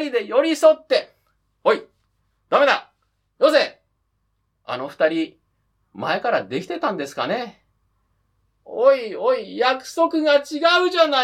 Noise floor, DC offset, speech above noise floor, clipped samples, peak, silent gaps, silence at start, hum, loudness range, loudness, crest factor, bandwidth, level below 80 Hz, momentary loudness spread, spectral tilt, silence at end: -70 dBFS; under 0.1%; 51 dB; under 0.1%; -2 dBFS; none; 0 s; none; 6 LU; -20 LUFS; 18 dB; 15 kHz; -70 dBFS; 11 LU; -3.5 dB/octave; 0 s